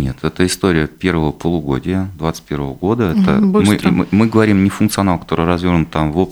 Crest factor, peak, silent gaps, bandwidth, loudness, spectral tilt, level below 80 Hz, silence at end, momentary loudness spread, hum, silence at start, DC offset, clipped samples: 14 dB; 0 dBFS; none; over 20 kHz; -15 LUFS; -6.5 dB/octave; -36 dBFS; 0 s; 8 LU; none; 0 s; under 0.1%; under 0.1%